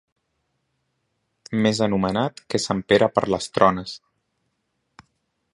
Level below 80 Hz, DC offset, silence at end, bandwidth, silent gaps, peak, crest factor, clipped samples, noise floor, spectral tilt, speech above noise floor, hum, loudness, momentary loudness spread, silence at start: -54 dBFS; under 0.1%; 1.55 s; 11.5 kHz; none; -2 dBFS; 24 dB; under 0.1%; -74 dBFS; -5 dB/octave; 53 dB; none; -21 LUFS; 11 LU; 1.5 s